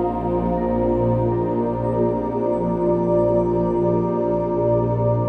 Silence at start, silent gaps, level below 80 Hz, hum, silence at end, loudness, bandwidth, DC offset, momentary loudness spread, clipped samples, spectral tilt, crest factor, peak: 0 s; none; -36 dBFS; 60 Hz at -50 dBFS; 0 s; -20 LUFS; 3.8 kHz; under 0.1%; 3 LU; under 0.1%; -11.5 dB/octave; 12 dB; -8 dBFS